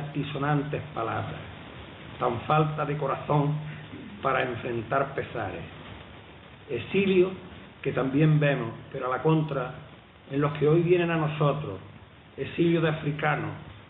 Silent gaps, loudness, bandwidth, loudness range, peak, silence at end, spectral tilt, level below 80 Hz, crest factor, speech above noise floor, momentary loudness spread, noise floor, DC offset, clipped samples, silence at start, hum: none; -27 LUFS; 4 kHz; 4 LU; -10 dBFS; 0.05 s; -11.5 dB/octave; -56 dBFS; 18 dB; 23 dB; 19 LU; -49 dBFS; under 0.1%; under 0.1%; 0 s; none